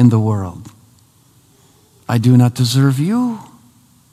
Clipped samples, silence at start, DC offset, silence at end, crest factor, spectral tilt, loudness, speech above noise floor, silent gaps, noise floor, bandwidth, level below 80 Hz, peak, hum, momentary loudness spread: under 0.1%; 0 s; under 0.1%; 0.7 s; 16 dB; -7 dB/octave; -15 LUFS; 38 dB; none; -51 dBFS; 14.5 kHz; -54 dBFS; 0 dBFS; none; 19 LU